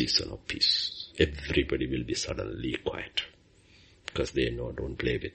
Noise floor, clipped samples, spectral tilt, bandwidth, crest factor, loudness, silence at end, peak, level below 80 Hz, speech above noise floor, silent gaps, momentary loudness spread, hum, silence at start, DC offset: -59 dBFS; under 0.1%; -4 dB/octave; 8.4 kHz; 22 dB; -30 LUFS; 0.05 s; -8 dBFS; -44 dBFS; 29 dB; none; 11 LU; none; 0 s; under 0.1%